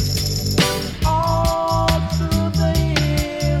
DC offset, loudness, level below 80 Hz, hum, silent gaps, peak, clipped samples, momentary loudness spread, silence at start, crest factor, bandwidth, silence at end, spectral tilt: under 0.1%; -19 LUFS; -26 dBFS; none; none; -6 dBFS; under 0.1%; 3 LU; 0 s; 12 dB; 17.5 kHz; 0 s; -5 dB/octave